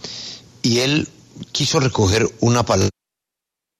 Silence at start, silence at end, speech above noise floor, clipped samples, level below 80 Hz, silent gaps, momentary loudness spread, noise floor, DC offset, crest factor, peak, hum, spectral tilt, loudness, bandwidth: 0.05 s; 0.9 s; 68 dB; under 0.1%; -46 dBFS; none; 15 LU; -85 dBFS; under 0.1%; 16 dB; -4 dBFS; none; -4.5 dB/octave; -18 LUFS; 13.5 kHz